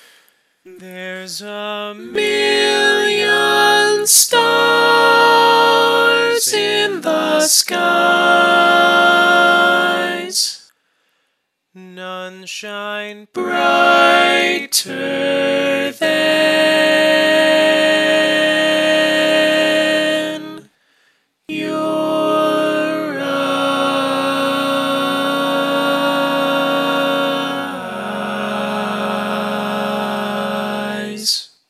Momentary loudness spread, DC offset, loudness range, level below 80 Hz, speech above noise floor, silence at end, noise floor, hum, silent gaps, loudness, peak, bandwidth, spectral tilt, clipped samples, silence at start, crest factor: 14 LU; under 0.1%; 8 LU; -74 dBFS; 54 dB; 0.25 s; -70 dBFS; none; none; -14 LUFS; 0 dBFS; 16 kHz; -2 dB/octave; under 0.1%; 0.65 s; 16 dB